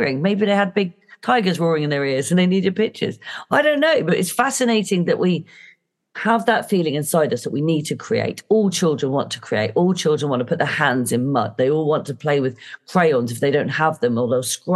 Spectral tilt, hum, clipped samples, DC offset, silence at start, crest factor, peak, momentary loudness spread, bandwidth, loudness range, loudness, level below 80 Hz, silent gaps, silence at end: -5 dB/octave; none; under 0.1%; under 0.1%; 0 s; 16 dB; -2 dBFS; 6 LU; 12.5 kHz; 2 LU; -19 LUFS; -70 dBFS; none; 0 s